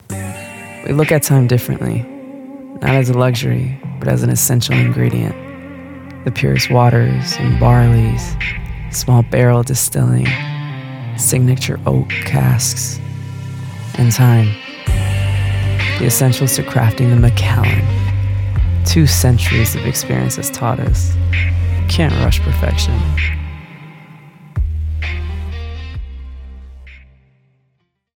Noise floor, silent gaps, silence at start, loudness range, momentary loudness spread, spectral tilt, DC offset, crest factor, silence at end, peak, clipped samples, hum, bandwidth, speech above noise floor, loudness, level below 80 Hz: -65 dBFS; none; 0.1 s; 7 LU; 15 LU; -5 dB/octave; under 0.1%; 14 dB; 1.2 s; 0 dBFS; under 0.1%; none; 18 kHz; 52 dB; -15 LUFS; -26 dBFS